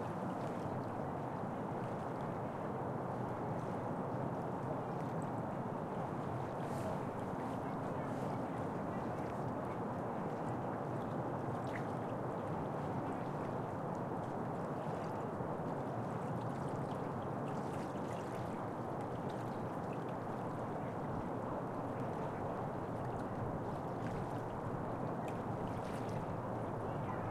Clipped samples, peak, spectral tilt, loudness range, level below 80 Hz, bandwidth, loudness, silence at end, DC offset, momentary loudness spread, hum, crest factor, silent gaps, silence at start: under 0.1%; -26 dBFS; -8 dB/octave; 1 LU; -64 dBFS; 15 kHz; -41 LUFS; 0 s; under 0.1%; 1 LU; none; 14 dB; none; 0 s